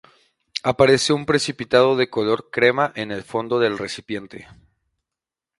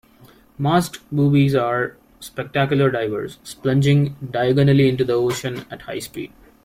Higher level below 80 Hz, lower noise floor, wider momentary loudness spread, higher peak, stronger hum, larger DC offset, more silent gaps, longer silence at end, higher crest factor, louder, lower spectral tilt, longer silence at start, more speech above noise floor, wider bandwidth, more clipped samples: about the same, -56 dBFS vs -52 dBFS; first, -87 dBFS vs -50 dBFS; about the same, 14 LU vs 16 LU; first, 0 dBFS vs -4 dBFS; neither; neither; neither; first, 1.15 s vs 0.4 s; about the same, 20 dB vs 16 dB; about the same, -20 LUFS vs -19 LUFS; second, -4.5 dB/octave vs -7 dB/octave; about the same, 0.55 s vs 0.6 s; first, 67 dB vs 31 dB; second, 11.5 kHz vs 15.5 kHz; neither